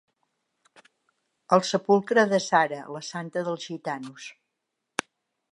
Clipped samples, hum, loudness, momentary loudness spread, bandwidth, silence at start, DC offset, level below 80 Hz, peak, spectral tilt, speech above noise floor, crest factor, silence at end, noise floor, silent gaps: under 0.1%; none; -25 LUFS; 14 LU; 11.5 kHz; 1.5 s; under 0.1%; -82 dBFS; -6 dBFS; -4.5 dB/octave; 57 dB; 22 dB; 1.2 s; -82 dBFS; none